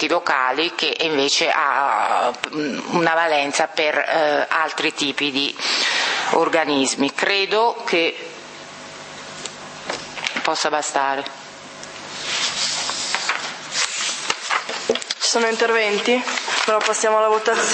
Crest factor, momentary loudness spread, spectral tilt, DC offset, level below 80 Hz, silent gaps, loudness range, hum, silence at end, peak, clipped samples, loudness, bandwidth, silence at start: 20 dB; 15 LU; -1.5 dB/octave; under 0.1%; -70 dBFS; none; 6 LU; none; 0 s; 0 dBFS; under 0.1%; -19 LUFS; 8.8 kHz; 0 s